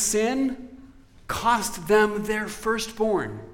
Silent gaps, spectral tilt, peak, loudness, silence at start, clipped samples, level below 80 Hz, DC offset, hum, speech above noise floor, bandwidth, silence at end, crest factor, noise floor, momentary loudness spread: none; -3.5 dB/octave; -8 dBFS; -24 LUFS; 0 s; under 0.1%; -48 dBFS; under 0.1%; none; 24 dB; 17 kHz; 0 s; 18 dB; -49 dBFS; 9 LU